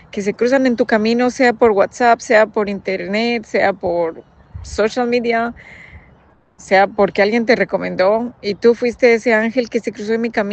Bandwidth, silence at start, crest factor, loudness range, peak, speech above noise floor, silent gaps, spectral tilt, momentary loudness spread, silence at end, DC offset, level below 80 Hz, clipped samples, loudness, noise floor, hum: 8.6 kHz; 0.15 s; 16 dB; 5 LU; 0 dBFS; 35 dB; none; -5 dB/octave; 8 LU; 0 s; under 0.1%; -48 dBFS; under 0.1%; -16 LUFS; -50 dBFS; none